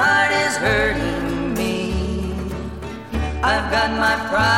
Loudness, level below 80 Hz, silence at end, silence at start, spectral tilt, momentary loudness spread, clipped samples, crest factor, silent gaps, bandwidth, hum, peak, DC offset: -20 LUFS; -30 dBFS; 0 s; 0 s; -4.5 dB/octave; 11 LU; under 0.1%; 16 dB; none; 16.5 kHz; none; -4 dBFS; 0.3%